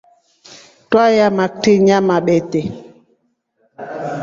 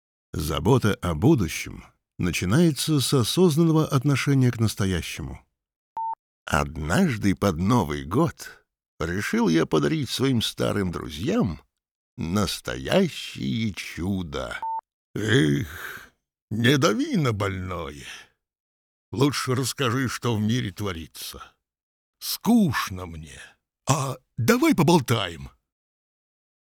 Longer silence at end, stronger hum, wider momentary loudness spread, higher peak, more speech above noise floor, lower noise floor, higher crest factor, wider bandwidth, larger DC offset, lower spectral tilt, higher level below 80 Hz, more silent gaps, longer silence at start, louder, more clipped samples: second, 0 s vs 1.25 s; neither; about the same, 18 LU vs 16 LU; about the same, -2 dBFS vs -4 dBFS; first, 51 dB vs 31 dB; first, -64 dBFS vs -55 dBFS; about the same, 16 dB vs 20 dB; second, 7.6 kHz vs 19.5 kHz; neither; about the same, -6 dB/octave vs -5.5 dB/octave; second, -56 dBFS vs -48 dBFS; second, none vs 5.76-5.96 s, 6.19-6.46 s, 8.88-8.98 s, 11.91-12.17 s, 14.93-15.14 s, 16.42-16.48 s, 18.60-19.12 s, 21.83-22.13 s; first, 0.5 s vs 0.35 s; first, -14 LUFS vs -24 LUFS; neither